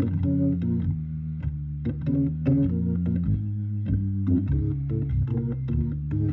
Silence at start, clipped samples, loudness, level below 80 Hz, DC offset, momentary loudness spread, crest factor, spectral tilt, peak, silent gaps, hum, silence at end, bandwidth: 0 s; under 0.1%; -26 LUFS; -36 dBFS; under 0.1%; 7 LU; 14 dB; -13 dB/octave; -12 dBFS; none; none; 0 s; 4 kHz